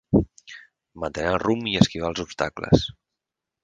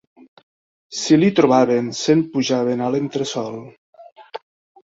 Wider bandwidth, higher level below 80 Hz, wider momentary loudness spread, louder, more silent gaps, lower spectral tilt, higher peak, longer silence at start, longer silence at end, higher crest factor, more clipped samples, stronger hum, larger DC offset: first, 9.6 kHz vs 8 kHz; first, -42 dBFS vs -62 dBFS; second, 17 LU vs 22 LU; second, -24 LUFS vs -18 LUFS; second, none vs 3.78-3.93 s, 4.12-4.16 s; about the same, -6 dB/octave vs -5.5 dB/octave; about the same, 0 dBFS vs -2 dBFS; second, 0.1 s vs 0.9 s; first, 0.7 s vs 0.5 s; first, 24 dB vs 18 dB; neither; neither; neither